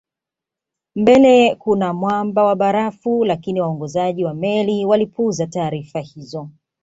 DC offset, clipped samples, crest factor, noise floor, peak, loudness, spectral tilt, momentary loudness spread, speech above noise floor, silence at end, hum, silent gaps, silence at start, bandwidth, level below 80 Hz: under 0.1%; under 0.1%; 16 dB; -86 dBFS; -2 dBFS; -17 LUFS; -6.5 dB/octave; 17 LU; 69 dB; 0.3 s; none; none; 0.95 s; 8 kHz; -56 dBFS